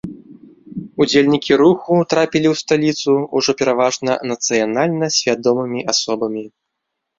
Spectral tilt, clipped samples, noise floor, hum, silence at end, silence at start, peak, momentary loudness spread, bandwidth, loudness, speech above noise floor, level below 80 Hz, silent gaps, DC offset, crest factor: -4 dB/octave; under 0.1%; -77 dBFS; none; 0.7 s; 0.05 s; -2 dBFS; 9 LU; 7.8 kHz; -16 LUFS; 61 dB; -56 dBFS; none; under 0.1%; 16 dB